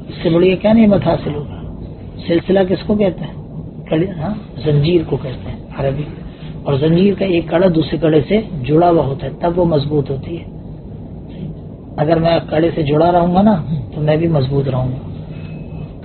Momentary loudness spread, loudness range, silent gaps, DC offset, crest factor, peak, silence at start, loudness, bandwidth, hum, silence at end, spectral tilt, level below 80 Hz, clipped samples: 17 LU; 4 LU; none; under 0.1%; 16 dB; 0 dBFS; 0 s; -15 LUFS; 4.5 kHz; none; 0 s; -7 dB/octave; -36 dBFS; under 0.1%